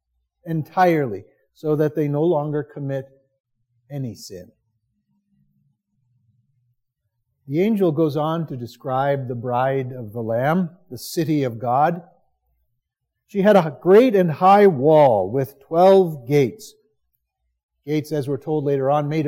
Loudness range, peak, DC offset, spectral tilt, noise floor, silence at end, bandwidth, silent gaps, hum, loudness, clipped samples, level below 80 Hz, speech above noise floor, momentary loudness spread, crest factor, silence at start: 18 LU; -2 dBFS; under 0.1%; -7.5 dB/octave; -78 dBFS; 0 s; 16.5 kHz; 3.40-3.44 s, 17.63-17.69 s; none; -19 LUFS; under 0.1%; -68 dBFS; 59 dB; 17 LU; 18 dB; 0.45 s